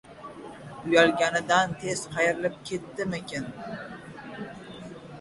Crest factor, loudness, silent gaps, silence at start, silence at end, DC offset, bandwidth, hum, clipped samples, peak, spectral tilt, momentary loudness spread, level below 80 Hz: 22 dB; -26 LUFS; none; 0.05 s; 0 s; under 0.1%; 11.5 kHz; none; under 0.1%; -6 dBFS; -4 dB/octave; 21 LU; -62 dBFS